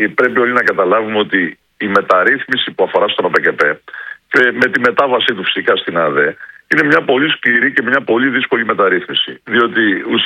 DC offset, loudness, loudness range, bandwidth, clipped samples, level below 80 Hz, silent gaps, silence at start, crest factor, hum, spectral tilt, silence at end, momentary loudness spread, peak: under 0.1%; -13 LUFS; 1 LU; 11.5 kHz; 0.1%; -60 dBFS; none; 0 s; 14 dB; none; -5.5 dB/octave; 0 s; 5 LU; 0 dBFS